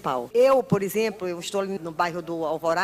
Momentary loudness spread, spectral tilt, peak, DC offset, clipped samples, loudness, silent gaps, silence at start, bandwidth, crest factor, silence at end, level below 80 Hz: 10 LU; -5 dB/octave; -8 dBFS; under 0.1%; under 0.1%; -24 LUFS; none; 0 s; 16 kHz; 16 dB; 0 s; -62 dBFS